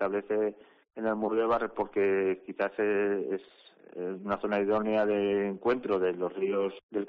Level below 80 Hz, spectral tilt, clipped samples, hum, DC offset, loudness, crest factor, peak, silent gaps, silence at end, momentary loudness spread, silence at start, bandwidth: -66 dBFS; -5 dB/octave; under 0.1%; none; under 0.1%; -30 LUFS; 12 dB; -18 dBFS; 6.83-6.89 s; 0 s; 8 LU; 0 s; 5.2 kHz